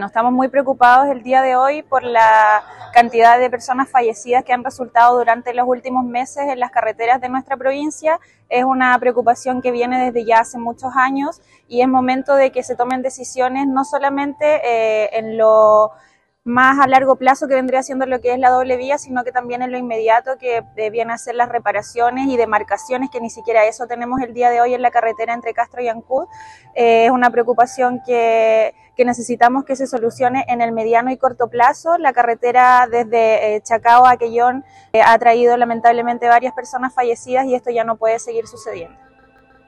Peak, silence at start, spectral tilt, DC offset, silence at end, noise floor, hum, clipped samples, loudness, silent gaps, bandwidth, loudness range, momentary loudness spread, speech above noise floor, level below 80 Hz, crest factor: 0 dBFS; 0 s; -4 dB/octave; under 0.1%; 0.8 s; -50 dBFS; none; under 0.1%; -15 LUFS; none; 11.5 kHz; 5 LU; 11 LU; 35 dB; -58 dBFS; 14 dB